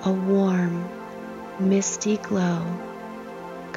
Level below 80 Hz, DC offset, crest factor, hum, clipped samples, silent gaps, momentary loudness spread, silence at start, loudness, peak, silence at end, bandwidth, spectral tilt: -62 dBFS; under 0.1%; 14 dB; none; under 0.1%; none; 15 LU; 0 s; -24 LUFS; -10 dBFS; 0 s; 7.6 kHz; -6 dB/octave